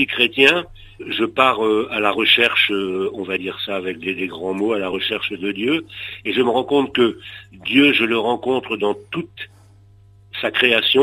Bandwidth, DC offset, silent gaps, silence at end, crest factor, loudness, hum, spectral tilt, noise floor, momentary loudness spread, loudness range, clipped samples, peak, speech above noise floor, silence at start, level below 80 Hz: 15 kHz; under 0.1%; none; 0 s; 20 dB; -18 LUFS; 50 Hz at -55 dBFS; -4.5 dB/octave; -48 dBFS; 15 LU; 5 LU; under 0.1%; 0 dBFS; 29 dB; 0 s; -54 dBFS